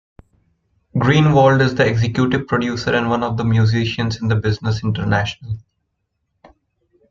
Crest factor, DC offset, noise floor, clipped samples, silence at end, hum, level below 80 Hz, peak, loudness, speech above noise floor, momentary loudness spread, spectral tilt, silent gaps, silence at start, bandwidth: 16 dB; under 0.1%; -72 dBFS; under 0.1%; 1.5 s; none; -44 dBFS; -2 dBFS; -17 LUFS; 56 dB; 9 LU; -7 dB/octave; none; 0.95 s; 7.4 kHz